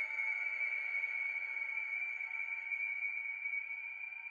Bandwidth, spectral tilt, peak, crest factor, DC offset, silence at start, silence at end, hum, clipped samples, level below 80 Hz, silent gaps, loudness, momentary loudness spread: 7.2 kHz; -0.5 dB/octave; -26 dBFS; 12 dB; under 0.1%; 0 s; 0 s; none; under 0.1%; -88 dBFS; none; -37 LUFS; 4 LU